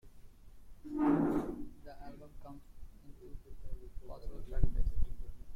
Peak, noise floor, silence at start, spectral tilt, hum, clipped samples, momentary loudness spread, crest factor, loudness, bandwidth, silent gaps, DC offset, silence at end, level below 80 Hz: -12 dBFS; -53 dBFS; 0.05 s; -9 dB/octave; none; under 0.1%; 24 LU; 22 dB; -36 LUFS; 4.3 kHz; none; under 0.1%; 0 s; -40 dBFS